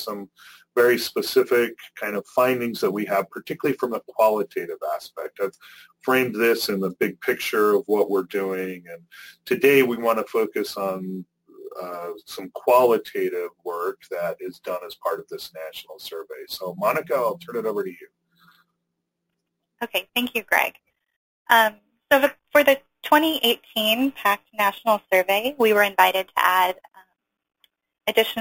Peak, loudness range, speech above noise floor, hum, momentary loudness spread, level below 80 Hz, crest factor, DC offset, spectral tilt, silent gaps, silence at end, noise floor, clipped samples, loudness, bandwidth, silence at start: -2 dBFS; 8 LU; 56 dB; none; 16 LU; -68 dBFS; 22 dB; under 0.1%; -3.5 dB/octave; 21.16-21.45 s; 0 s; -79 dBFS; under 0.1%; -22 LUFS; 17 kHz; 0 s